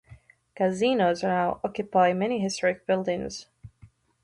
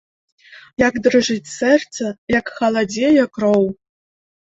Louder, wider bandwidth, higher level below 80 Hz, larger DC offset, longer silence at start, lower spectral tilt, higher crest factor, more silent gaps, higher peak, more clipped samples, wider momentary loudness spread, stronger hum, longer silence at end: second, -26 LUFS vs -17 LUFS; first, 11.5 kHz vs 8 kHz; second, -60 dBFS vs -52 dBFS; neither; second, 0.1 s vs 0.5 s; about the same, -5 dB/octave vs -4.5 dB/octave; about the same, 18 dB vs 16 dB; second, none vs 0.73-0.77 s, 2.18-2.27 s; second, -8 dBFS vs -2 dBFS; neither; about the same, 9 LU vs 10 LU; neither; second, 0.4 s vs 0.8 s